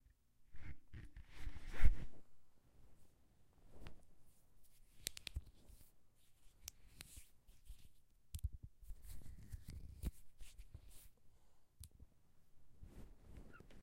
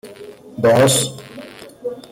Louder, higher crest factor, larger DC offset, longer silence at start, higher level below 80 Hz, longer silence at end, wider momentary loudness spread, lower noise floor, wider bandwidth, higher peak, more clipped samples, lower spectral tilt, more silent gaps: second, -53 LUFS vs -15 LUFS; first, 26 dB vs 16 dB; neither; first, 0.55 s vs 0.05 s; about the same, -50 dBFS vs -54 dBFS; about the same, 0 s vs 0.1 s; second, 17 LU vs 24 LU; first, -68 dBFS vs -38 dBFS; about the same, 15.5 kHz vs 17 kHz; second, -16 dBFS vs -4 dBFS; neither; about the same, -4 dB/octave vs -4 dB/octave; neither